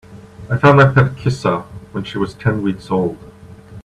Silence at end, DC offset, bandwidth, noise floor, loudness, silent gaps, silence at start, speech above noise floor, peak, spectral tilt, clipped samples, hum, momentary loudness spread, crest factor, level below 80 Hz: 0.05 s; under 0.1%; 10 kHz; -38 dBFS; -16 LUFS; none; 0.1 s; 23 dB; 0 dBFS; -7.5 dB/octave; under 0.1%; none; 15 LU; 16 dB; -44 dBFS